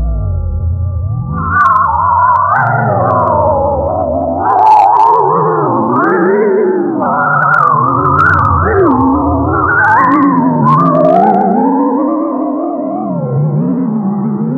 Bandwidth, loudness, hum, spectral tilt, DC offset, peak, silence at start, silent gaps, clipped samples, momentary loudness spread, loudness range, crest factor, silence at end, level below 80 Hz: 6.8 kHz; -10 LUFS; none; -10 dB/octave; under 0.1%; 0 dBFS; 0 s; none; 0.2%; 8 LU; 2 LU; 10 dB; 0 s; -28 dBFS